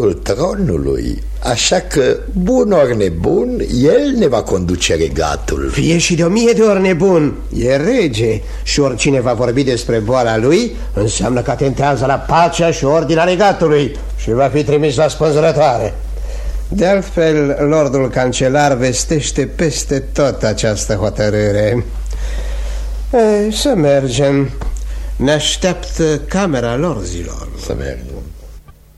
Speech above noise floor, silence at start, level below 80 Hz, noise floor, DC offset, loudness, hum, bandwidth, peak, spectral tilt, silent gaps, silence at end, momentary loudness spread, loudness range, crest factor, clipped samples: 23 dB; 0 s; -26 dBFS; -36 dBFS; under 0.1%; -14 LUFS; none; 13.5 kHz; 0 dBFS; -5 dB/octave; none; 0.25 s; 11 LU; 3 LU; 14 dB; under 0.1%